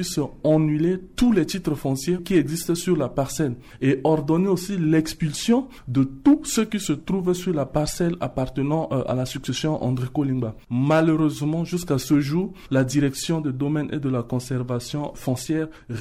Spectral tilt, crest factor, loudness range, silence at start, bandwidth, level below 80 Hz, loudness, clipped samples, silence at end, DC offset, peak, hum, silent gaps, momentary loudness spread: -6 dB/octave; 14 dB; 3 LU; 0 s; 16 kHz; -46 dBFS; -23 LUFS; under 0.1%; 0 s; under 0.1%; -8 dBFS; none; none; 7 LU